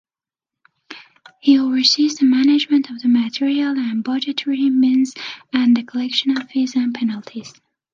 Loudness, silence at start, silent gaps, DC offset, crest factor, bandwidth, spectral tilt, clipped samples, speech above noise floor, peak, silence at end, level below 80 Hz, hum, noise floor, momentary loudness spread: -17 LUFS; 0.9 s; none; under 0.1%; 16 dB; 7.4 kHz; -3 dB/octave; under 0.1%; 72 dB; -2 dBFS; 0.45 s; -70 dBFS; none; -90 dBFS; 12 LU